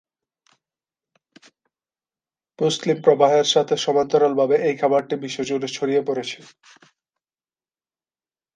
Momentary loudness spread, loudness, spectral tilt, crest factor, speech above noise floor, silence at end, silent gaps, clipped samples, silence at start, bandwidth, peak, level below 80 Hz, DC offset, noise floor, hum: 10 LU; -20 LUFS; -4 dB/octave; 20 dB; over 70 dB; 2.2 s; none; under 0.1%; 2.6 s; 9.6 kHz; -2 dBFS; -70 dBFS; under 0.1%; under -90 dBFS; none